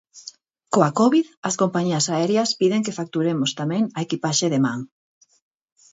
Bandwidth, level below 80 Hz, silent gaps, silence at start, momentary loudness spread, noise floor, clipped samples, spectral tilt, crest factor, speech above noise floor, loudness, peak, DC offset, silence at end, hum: 8 kHz; -68 dBFS; 1.37-1.43 s; 0.15 s; 10 LU; -45 dBFS; under 0.1%; -4.5 dB/octave; 20 dB; 24 dB; -21 LUFS; -2 dBFS; under 0.1%; 1.05 s; none